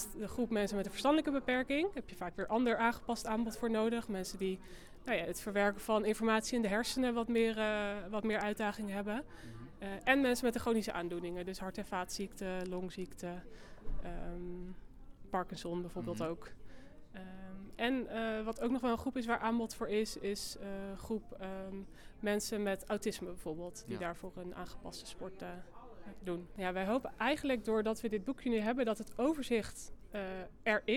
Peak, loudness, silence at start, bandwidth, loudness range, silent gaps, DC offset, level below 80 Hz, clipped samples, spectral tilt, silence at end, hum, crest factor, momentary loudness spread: -16 dBFS; -37 LUFS; 0 s; 18 kHz; 9 LU; none; under 0.1%; -54 dBFS; under 0.1%; -4.5 dB/octave; 0 s; none; 22 dB; 15 LU